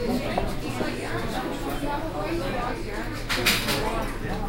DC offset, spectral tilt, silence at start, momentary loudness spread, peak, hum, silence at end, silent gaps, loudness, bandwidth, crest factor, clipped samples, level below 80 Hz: under 0.1%; -4 dB/octave; 0 s; 9 LU; -6 dBFS; none; 0 s; none; -27 LUFS; 16.5 kHz; 20 dB; under 0.1%; -34 dBFS